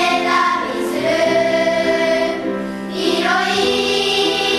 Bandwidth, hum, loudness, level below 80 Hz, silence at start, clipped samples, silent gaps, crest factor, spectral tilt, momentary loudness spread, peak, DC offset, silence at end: 13.5 kHz; none; -16 LUFS; -50 dBFS; 0 s; under 0.1%; none; 14 dB; -3.5 dB/octave; 6 LU; -4 dBFS; under 0.1%; 0 s